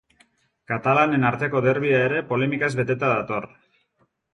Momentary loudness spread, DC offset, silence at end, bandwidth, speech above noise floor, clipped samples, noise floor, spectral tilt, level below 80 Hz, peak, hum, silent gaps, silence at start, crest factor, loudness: 10 LU; under 0.1%; 0.9 s; 10.5 kHz; 47 dB; under 0.1%; -68 dBFS; -7.5 dB/octave; -60 dBFS; -4 dBFS; none; none; 0.7 s; 18 dB; -22 LUFS